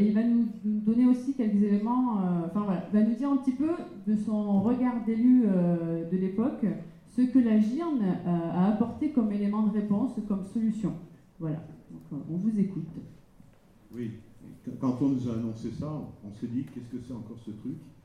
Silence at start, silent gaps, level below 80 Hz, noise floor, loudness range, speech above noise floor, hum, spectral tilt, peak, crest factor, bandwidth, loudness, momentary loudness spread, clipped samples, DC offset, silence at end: 0 s; none; -62 dBFS; -57 dBFS; 8 LU; 29 dB; none; -9.5 dB/octave; -12 dBFS; 14 dB; 9.4 kHz; -28 LUFS; 16 LU; under 0.1%; under 0.1%; 0.15 s